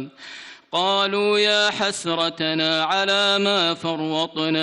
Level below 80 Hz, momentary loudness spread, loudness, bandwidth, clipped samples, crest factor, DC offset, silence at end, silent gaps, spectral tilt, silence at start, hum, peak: -66 dBFS; 9 LU; -20 LUFS; 12 kHz; under 0.1%; 14 dB; under 0.1%; 0 s; none; -3 dB/octave; 0 s; none; -8 dBFS